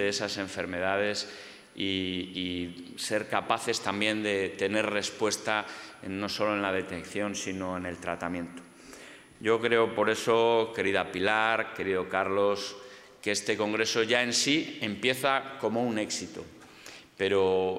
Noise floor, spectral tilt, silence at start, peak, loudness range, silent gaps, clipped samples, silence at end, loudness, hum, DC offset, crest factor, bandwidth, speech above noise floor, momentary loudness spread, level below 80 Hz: -50 dBFS; -3 dB/octave; 0 s; -8 dBFS; 5 LU; none; under 0.1%; 0 s; -29 LUFS; none; under 0.1%; 22 dB; 16 kHz; 20 dB; 16 LU; -70 dBFS